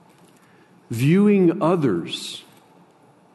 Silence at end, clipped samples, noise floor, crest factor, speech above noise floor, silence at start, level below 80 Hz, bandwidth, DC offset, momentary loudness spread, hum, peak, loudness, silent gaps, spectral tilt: 0.95 s; under 0.1%; -54 dBFS; 14 dB; 35 dB; 0.9 s; -64 dBFS; 12.5 kHz; under 0.1%; 17 LU; none; -6 dBFS; -19 LUFS; none; -7 dB/octave